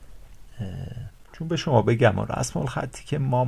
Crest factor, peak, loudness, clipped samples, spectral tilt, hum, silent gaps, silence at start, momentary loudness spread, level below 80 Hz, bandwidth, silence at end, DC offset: 18 dB; -6 dBFS; -25 LUFS; under 0.1%; -6 dB/octave; none; none; 0 s; 17 LU; -46 dBFS; 13 kHz; 0 s; under 0.1%